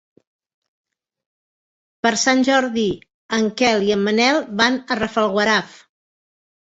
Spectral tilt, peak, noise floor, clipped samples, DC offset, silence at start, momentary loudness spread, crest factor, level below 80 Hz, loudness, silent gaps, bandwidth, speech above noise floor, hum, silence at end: -3.5 dB/octave; -2 dBFS; under -90 dBFS; under 0.1%; under 0.1%; 2.05 s; 6 LU; 18 dB; -56 dBFS; -18 LUFS; 3.14-3.29 s; 8.2 kHz; over 72 dB; none; 1 s